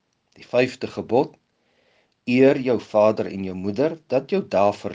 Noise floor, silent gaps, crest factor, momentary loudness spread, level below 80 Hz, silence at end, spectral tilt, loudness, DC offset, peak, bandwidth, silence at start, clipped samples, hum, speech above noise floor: -65 dBFS; none; 18 dB; 11 LU; -68 dBFS; 0 s; -7 dB/octave; -22 LUFS; under 0.1%; -4 dBFS; 7.8 kHz; 0.4 s; under 0.1%; none; 44 dB